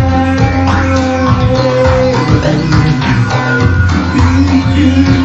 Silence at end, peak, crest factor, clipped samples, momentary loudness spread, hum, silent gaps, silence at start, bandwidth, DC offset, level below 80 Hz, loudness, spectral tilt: 0 s; 0 dBFS; 10 dB; 0.1%; 2 LU; none; none; 0 s; 8 kHz; 1%; -22 dBFS; -10 LUFS; -7 dB/octave